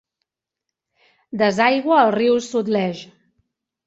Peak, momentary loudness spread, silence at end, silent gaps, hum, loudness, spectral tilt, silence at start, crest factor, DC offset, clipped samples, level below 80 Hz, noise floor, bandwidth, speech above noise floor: -2 dBFS; 12 LU; 0.8 s; none; none; -18 LUFS; -5 dB/octave; 1.35 s; 18 dB; under 0.1%; under 0.1%; -66 dBFS; -83 dBFS; 8.2 kHz; 66 dB